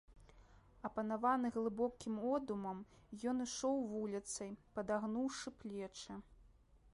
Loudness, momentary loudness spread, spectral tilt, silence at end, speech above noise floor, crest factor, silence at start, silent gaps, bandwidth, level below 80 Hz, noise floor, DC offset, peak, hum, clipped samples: -42 LUFS; 12 LU; -4.5 dB/octave; 0.15 s; 26 dB; 18 dB; 0.1 s; none; 11.5 kHz; -68 dBFS; -67 dBFS; under 0.1%; -24 dBFS; none; under 0.1%